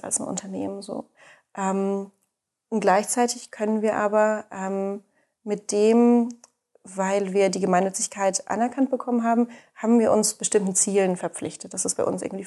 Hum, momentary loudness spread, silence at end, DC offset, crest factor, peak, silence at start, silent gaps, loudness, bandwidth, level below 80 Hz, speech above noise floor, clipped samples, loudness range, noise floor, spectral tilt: none; 12 LU; 0 s; under 0.1%; 18 dB; -6 dBFS; 0.05 s; none; -23 LUFS; 12.5 kHz; -70 dBFS; 53 dB; under 0.1%; 3 LU; -76 dBFS; -4.5 dB/octave